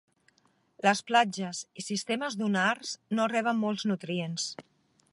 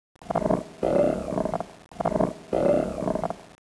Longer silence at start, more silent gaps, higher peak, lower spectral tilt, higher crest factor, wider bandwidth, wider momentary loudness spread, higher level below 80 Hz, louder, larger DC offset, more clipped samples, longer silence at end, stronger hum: first, 0.85 s vs 0.2 s; neither; about the same, -8 dBFS vs -8 dBFS; second, -4 dB/octave vs -7.5 dB/octave; about the same, 22 dB vs 18 dB; about the same, 11.5 kHz vs 11 kHz; about the same, 10 LU vs 8 LU; second, -80 dBFS vs -48 dBFS; second, -29 LUFS vs -26 LUFS; neither; neither; first, 0.5 s vs 0.2 s; neither